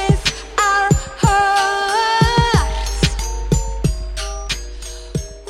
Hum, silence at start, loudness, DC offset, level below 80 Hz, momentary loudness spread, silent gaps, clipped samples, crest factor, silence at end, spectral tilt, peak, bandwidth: none; 0 s; -18 LUFS; under 0.1%; -24 dBFS; 12 LU; none; under 0.1%; 16 dB; 0 s; -4 dB/octave; 0 dBFS; 15 kHz